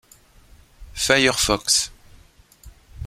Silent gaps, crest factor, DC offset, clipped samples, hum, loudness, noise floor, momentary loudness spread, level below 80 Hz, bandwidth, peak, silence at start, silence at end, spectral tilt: none; 22 dB; under 0.1%; under 0.1%; none; -19 LUFS; -52 dBFS; 13 LU; -44 dBFS; 16.5 kHz; -2 dBFS; 0.8 s; 0 s; -1.5 dB/octave